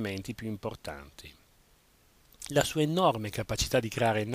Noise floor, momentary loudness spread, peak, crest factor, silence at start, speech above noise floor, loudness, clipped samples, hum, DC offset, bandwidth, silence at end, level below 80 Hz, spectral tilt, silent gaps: -64 dBFS; 18 LU; -10 dBFS; 20 dB; 0 s; 33 dB; -30 LUFS; under 0.1%; none; under 0.1%; 15.5 kHz; 0 s; -50 dBFS; -4.5 dB/octave; none